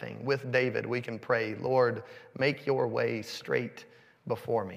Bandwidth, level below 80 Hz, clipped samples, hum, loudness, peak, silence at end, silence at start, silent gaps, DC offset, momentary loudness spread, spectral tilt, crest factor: 15.5 kHz; -78 dBFS; under 0.1%; none; -31 LUFS; -12 dBFS; 0 s; 0 s; none; under 0.1%; 13 LU; -6 dB/octave; 18 dB